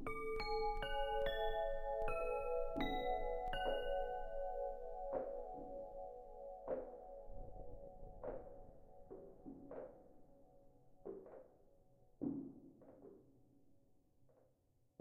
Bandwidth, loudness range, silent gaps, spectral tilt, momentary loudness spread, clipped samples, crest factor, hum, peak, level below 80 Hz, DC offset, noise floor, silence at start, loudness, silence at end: 13 kHz; 15 LU; none; -6 dB/octave; 18 LU; under 0.1%; 18 dB; none; -28 dBFS; -52 dBFS; under 0.1%; -77 dBFS; 0 s; -45 LUFS; 0.7 s